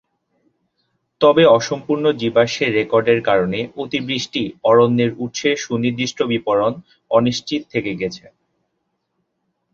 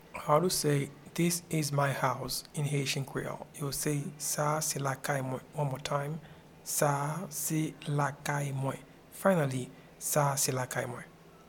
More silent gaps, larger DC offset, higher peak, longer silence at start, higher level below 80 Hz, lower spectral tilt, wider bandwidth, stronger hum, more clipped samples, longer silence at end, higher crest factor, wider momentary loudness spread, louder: neither; neither; first, -2 dBFS vs -10 dBFS; first, 1.2 s vs 0 s; first, -56 dBFS vs -64 dBFS; about the same, -5 dB/octave vs -4.5 dB/octave; second, 7.4 kHz vs 19 kHz; neither; neither; first, 1.55 s vs 0.05 s; about the same, 18 dB vs 22 dB; about the same, 10 LU vs 11 LU; first, -18 LUFS vs -32 LUFS